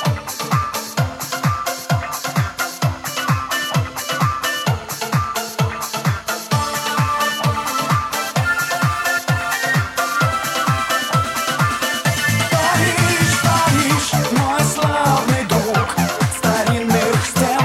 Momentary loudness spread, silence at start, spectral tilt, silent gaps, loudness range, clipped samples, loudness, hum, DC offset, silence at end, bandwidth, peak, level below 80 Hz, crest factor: 6 LU; 0 s; -4 dB/octave; none; 5 LU; under 0.1%; -18 LUFS; none; under 0.1%; 0 s; 17 kHz; -2 dBFS; -42 dBFS; 16 dB